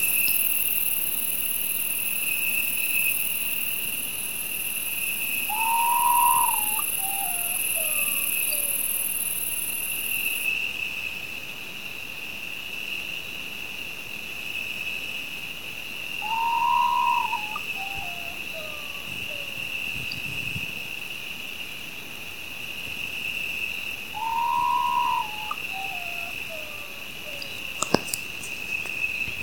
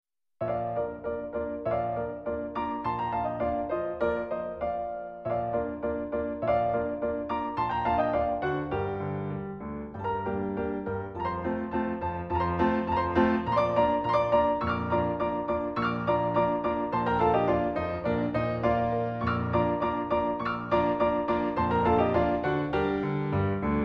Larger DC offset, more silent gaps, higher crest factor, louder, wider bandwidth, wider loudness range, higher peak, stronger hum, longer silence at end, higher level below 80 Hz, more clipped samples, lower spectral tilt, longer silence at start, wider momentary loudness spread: first, 0.8% vs under 0.1%; neither; first, 28 dB vs 18 dB; first, -25 LUFS vs -29 LUFS; first, 19 kHz vs 6.4 kHz; first, 9 LU vs 5 LU; first, 0 dBFS vs -10 dBFS; neither; about the same, 0 s vs 0 s; second, -58 dBFS vs -48 dBFS; neither; second, -0.5 dB/octave vs -9 dB/octave; second, 0 s vs 0.4 s; first, 12 LU vs 8 LU